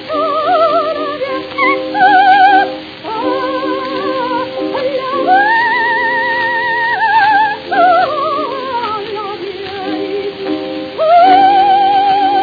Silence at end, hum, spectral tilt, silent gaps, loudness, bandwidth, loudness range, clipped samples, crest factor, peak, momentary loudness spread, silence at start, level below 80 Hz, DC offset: 0 s; none; -5.5 dB/octave; none; -12 LUFS; 5 kHz; 4 LU; under 0.1%; 12 dB; 0 dBFS; 12 LU; 0 s; -56 dBFS; under 0.1%